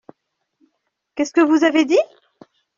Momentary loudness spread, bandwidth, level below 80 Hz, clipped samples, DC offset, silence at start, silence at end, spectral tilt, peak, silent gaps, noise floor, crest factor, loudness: 15 LU; 7.4 kHz; -66 dBFS; under 0.1%; under 0.1%; 1.15 s; 0.75 s; -3 dB/octave; -2 dBFS; none; -72 dBFS; 18 dB; -17 LUFS